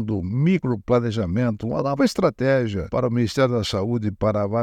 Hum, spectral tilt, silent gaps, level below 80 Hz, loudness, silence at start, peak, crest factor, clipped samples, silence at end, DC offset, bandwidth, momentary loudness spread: none; -7 dB/octave; none; -48 dBFS; -22 LUFS; 0 s; -4 dBFS; 16 dB; under 0.1%; 0 s; under 0.1%; 13.5 kHz; 4 LU